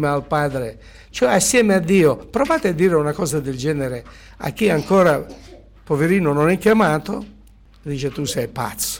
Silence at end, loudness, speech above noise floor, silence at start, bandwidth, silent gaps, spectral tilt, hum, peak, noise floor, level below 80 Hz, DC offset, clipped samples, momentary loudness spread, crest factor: 0 s; -18 LUFS; 28 dB; 0 s; 17.5 kHz; none; -5 dB/octave; none; -6 dBFS; -47 dBFS; -44 dBFS; under 0.1%; under 0.1%; 14 LU; 14 dB